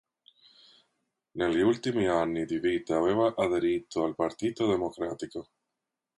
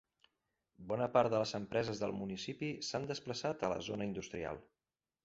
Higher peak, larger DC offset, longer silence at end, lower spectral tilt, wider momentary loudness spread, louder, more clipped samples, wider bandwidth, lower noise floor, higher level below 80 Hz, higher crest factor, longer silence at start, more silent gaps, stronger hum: about the same, -14 dBFS vs -16 dBFS; neither; first, 0.75 s vs 0.6 s; first, -6 dB/octave vs -4.5 dB/octave; about the same, 9 LU vs 11 LU; first, -28 LUFS vs -38 LUFS; neither; first, 11.5 kHz vs 8 kHz; second, -86 dBFS vs under -90 dBFS; first, -60 dBFS vs -68 dBFS; second, 16 dB vs 24 dB; first, 1.35 s vs 0.8 s; neither; neither